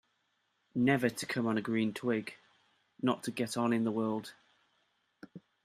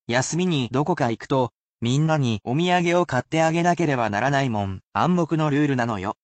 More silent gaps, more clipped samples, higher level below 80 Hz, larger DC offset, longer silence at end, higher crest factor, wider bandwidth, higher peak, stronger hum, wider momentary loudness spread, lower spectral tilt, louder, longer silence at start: second, none vs 1.55-1.75 s; neither; second, -76 dBFS vs -58 dBFS; neither; first, 0.25 s vs 0.1 s; first, 20 dB vs 14 dB; first, 15 kHz vs 9 kHz; second, -14 dBFS vs -8 dBFS; neither; first, 19 LU vs 5 LU; about the same, -5.5 dB/octave vs -6 dB/octave; second, -33 LUFS vs -22 LUFS; first, 0.75 s vs 0.1 s